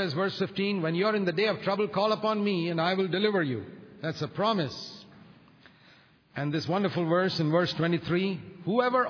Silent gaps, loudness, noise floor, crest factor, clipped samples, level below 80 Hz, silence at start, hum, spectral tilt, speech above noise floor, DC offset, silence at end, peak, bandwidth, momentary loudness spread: none; -28 LUFS; -59 dBFS; 16 dB; under 0.1%; -68 dBFS; 0 s; none; -7 dB/octave; 31 dB; under 0.1%; 0 s; -12 dBFS; 5.4 kHz; 10 LU